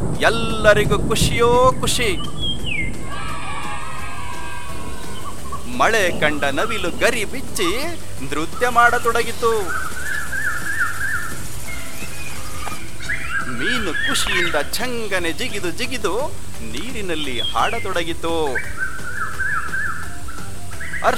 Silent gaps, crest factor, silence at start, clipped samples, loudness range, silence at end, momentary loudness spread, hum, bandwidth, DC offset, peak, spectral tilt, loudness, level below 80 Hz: none; 22 dB; 0 s; under 0.1%; 6 LU; 0 s; 15 LU; none; 16.5 kHz; 9%; 0 dBFS; -3.5 dB/octave; -21 LUFS; -36 dBFS